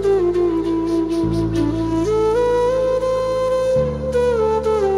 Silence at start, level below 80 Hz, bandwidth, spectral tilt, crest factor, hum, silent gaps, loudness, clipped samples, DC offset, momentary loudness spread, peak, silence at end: 0 s; -34 dBFS; 12 kHz; -7 dB/octave; 10 dB; none; none; -18 LUFS; under 0.1%; under 0.1%; 3 LU; -8 dBFS; 0 s